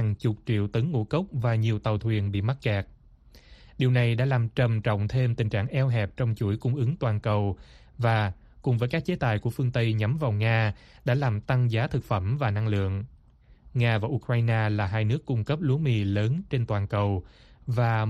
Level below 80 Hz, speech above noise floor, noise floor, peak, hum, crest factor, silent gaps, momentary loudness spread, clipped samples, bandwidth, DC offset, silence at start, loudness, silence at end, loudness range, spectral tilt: -50 dBFS; 30 dB; -56 dBFS; -12 dBFS; none; 14 dB; none; 5 LU; under 0.1%; 6.2 kHz; under 0.1%; 0 s; -27 LUFS; 0 s; 1 LU; -8.5 dB/octave